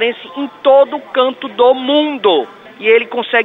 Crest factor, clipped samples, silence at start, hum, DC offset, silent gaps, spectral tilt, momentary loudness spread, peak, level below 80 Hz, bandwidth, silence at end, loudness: 12 dB; under 0.1%; 0 s; none; under 0.1%; none; -5.5 dB/octave; 8 LU; 0 dBFS; -62 dBFS; 4.1 kHz; 0 s; -13 LUFS